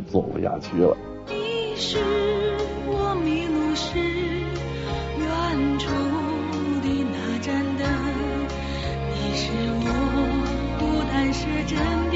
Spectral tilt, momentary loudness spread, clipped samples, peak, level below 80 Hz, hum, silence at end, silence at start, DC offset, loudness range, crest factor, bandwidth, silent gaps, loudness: -5 dB/octave; 5 LU; under 0.1%; -6 dBFS; -36 dBFS; none; 0 s; 0 s; under 0.1%; 1 LU; 18 dB; 8 kHz; none; -25 LUFS